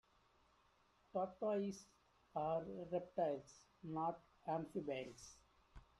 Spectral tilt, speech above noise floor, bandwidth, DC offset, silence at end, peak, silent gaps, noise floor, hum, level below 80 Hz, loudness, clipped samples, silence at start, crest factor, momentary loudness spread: -6.5 dB/octave; 31 dB; 12.5 kHz; under 0.1%; 0.15 s; -28 dBFS; none; -76 dBFS; none; -74 dBFS; -45 LUFS; under 0.1%; 1.15 s; 18 dB; 15 LU